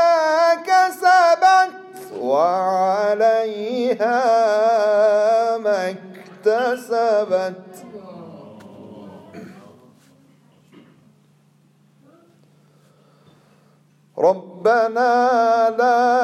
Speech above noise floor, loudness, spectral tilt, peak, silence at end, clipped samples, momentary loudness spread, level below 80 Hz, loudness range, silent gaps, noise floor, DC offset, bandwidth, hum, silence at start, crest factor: 40 dB; -17 LUFS; -4 dB/octave; -4 dBFS; 0 s; under 0.1%; 23 LU; -74 dBFS; 11 LU; none; -56 dBFS; under 0.1%; 13.5 kHz; none; 0 s; 14 dB